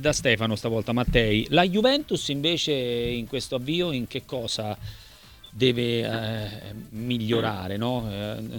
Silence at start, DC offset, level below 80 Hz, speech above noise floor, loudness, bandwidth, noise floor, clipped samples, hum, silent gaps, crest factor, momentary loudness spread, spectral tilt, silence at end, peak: 0 s; under 0.1%; -42 dBFS; 23 dB; -25 LUFS; 19 kHz; -49 dBFS; under 0.1%; none; none; 20 dB; 12 LU; -5 dB/octave; 0 s; -6 dBFS